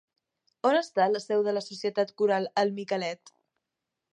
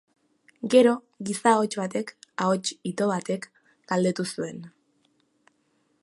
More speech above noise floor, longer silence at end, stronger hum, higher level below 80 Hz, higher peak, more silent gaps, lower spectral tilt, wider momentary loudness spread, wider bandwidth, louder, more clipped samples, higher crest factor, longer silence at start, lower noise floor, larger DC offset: first, 59 dB vs 45 dB; second, 0.95 s vs 1.35 s; neither; second, -84 dBFS vs -76 dBFS; second, -10 dBFS vs -6 dBFS; neither; about the same, -5 dB/octave vs -5 dB/octave; second, 6 LU vs 16 LU; second, 9.6 kHz vs 11.5 kHz; second, -28 LUFS vs -25 LUFS; neither; about the same, 18 dB vs 20 dB; about the same, 0.65 s vs 0.65 s; first, -86 dBFS vs -70 dBFS; neither